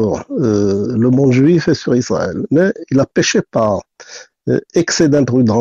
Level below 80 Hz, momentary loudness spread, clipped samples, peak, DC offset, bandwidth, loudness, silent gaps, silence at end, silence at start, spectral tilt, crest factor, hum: -48 dBFS; 7 LU; under 0.1%; -2 dBFS; under 0.1%; 7.8 kHz; -14 LUFS; none; 0 s; 0 s; -6 dB/octave; 12 dB; none